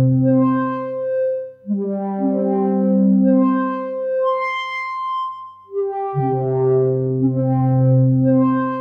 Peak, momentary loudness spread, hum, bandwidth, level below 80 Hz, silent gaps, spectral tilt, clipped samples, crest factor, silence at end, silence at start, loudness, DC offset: -6 dBFS; 9 LU; none; 5.6 kHz; -58 dBFS; none; -10.5 dB/octave; under 0.1%; 12 dB; 0 s; 0 s; -18 LUFS; under 0.1%